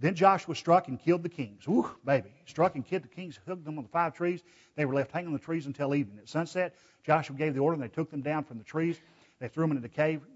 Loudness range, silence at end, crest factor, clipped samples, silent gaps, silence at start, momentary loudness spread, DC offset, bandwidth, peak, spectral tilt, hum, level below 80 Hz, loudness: 3 LU; 0.15 s; 22 dB; under 0.1%; none; 0 s; 14 LU; under 0.1%; 8 kHz; -10 dBFS; -7 dB/octave; none; -72 dBFS; -31 LUFS